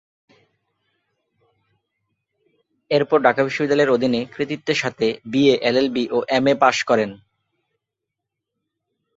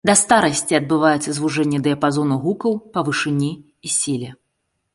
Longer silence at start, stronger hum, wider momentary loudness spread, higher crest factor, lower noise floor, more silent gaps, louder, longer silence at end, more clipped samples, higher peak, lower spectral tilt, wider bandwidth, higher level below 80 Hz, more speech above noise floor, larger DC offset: first, 2.9 s vs 0.05 s; neither; about the same, 7 LU vs 8 LU; about the same, 20 dB vs 18 dB; first, -82 dBFS vs -73 dBFS; neither; about the same, -19 LUFS vs -19 LUFS; first, 2 s vs 0.6 s; neither; about the same, -2 dBFS vs 0 dBFS; about the same, -5 dB/octave vs -4 dB/octave; second, 8 kHz vs 11.5 kHz; second, -64 dBFS vs -58 dBFS; first, 64 dB vs 54 dB; neither